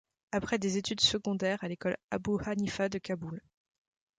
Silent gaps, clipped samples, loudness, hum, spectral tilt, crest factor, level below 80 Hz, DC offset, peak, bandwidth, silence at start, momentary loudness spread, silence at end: 2.04-2.09 s; under 0.1%; -32 LUFS; none; -4 dB/octave; 20 dB; -60 dBFS; under 0.1%; -14 dBFS; 9.4 kHz; 0.3 s; 11 LU; 0.8 s